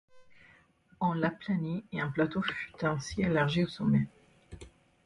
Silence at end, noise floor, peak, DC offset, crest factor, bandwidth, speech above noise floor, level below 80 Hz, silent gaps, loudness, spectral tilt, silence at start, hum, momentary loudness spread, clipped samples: 0.4 s; -63 dBFS; -14 dBFS; under 0.1%; 18 dB; 11 kHz; 33 dB; -58 dBFS; none; -31 LUFS; -6.5 dB/octave; 0.15 s; none; 9 LU; under 0.1%